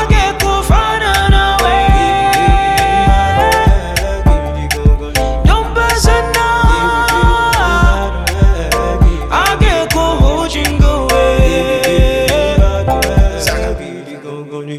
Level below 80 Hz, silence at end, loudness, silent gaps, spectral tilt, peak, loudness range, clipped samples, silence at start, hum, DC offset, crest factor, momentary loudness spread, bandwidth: -14 dBFS; 0 s; -12 LUFS; none; -5 dB/octave; 0 dBFS; 2 LU; under 0.1%; 0 s; none; under 0.1%; 10 dB; 5 LU; 15 kHz